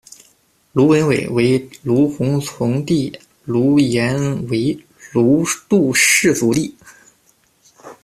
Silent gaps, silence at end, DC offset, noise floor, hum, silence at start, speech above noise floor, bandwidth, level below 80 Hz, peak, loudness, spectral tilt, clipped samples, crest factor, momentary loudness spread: none; 0.1 s; under 0.1%; -57 dBFS; none; 0.75 s; 42 dB; 14.5 kHz; -52 dBFS; -2 dBFS; -16 LUFS; -5 dB/octave; under 0.1%; 16 dB; 10 LU